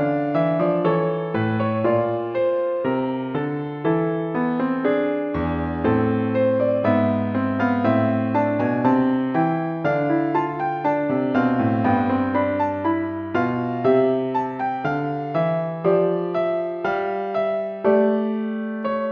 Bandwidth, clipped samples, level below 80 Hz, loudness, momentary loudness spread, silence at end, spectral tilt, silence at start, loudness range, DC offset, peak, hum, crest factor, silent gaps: 5.8 kHz; under 0.1%; -50 dBFS; -22 LUFS; 5 LU; 0 s; -9.5 dB/octave; 0 s; 2 LU; under 0.1%; -6 dBFS; none; 16 dB; none